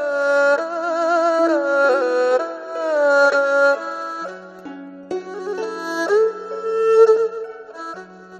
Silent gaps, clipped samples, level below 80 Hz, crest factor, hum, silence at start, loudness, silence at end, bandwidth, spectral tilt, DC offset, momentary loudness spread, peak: none; under 0.1%; -72 dBFS; 16 dB; none; 0 s; -18 LUFS; 0 s; 9.2 kHz; -3.5 dB/octave; under 0.1%; 18 LU; -2 dBFS